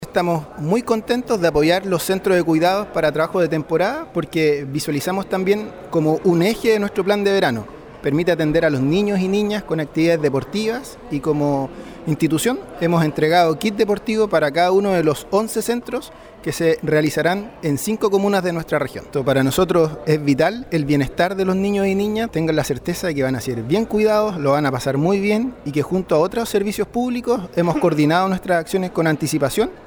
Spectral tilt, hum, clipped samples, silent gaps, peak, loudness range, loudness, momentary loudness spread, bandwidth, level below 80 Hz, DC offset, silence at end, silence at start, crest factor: -6 dB/octave; none; under 0.1%; none; -2 dBFS; 2 LU; -19 LUFS; 6 LU; over 20 kHz; -46 dBFS; under 0.1%; 0 s; 0 s; 16 dB